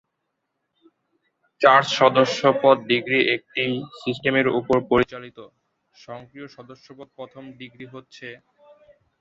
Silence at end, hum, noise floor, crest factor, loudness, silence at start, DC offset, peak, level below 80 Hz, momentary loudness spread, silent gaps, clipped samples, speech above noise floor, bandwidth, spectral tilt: 0.85 s; none; -78 dBFS; 24 dB; -19 LUFS; 1.6 s; under 0.1%; 0 dBFS; -58 dBFS; 24 LU; none; under 0.1%; 56 dB; 7.8 kHz; -5 dB/octave